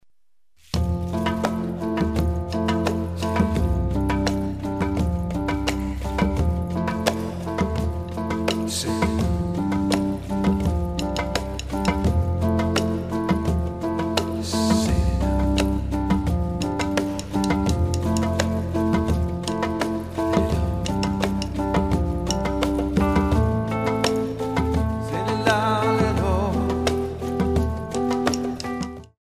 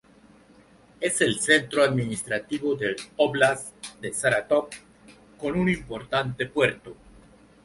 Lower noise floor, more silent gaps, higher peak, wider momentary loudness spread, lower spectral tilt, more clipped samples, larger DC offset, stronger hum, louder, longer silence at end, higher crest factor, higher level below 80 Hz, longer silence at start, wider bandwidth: first, -73 dBFS vs -55 dBFS; neither; about the same, -4 dBFS vs -4 dBFS; second, 5 LU vs 12 LU; first, -6 dB/octave vs -4 dB/octave; neither; first, 0.2% vs under 0.1%; neither; about the same, -24 LUFS vs -25 LUFS; second, 0.15 s vs 0.7 s; about the same, 18 dB vs 22 dB; first, -30 dBFS vs -56 dBFS; second, 0.75 s vs 1 s; first, 15.5 kHz vs 11.5 kHz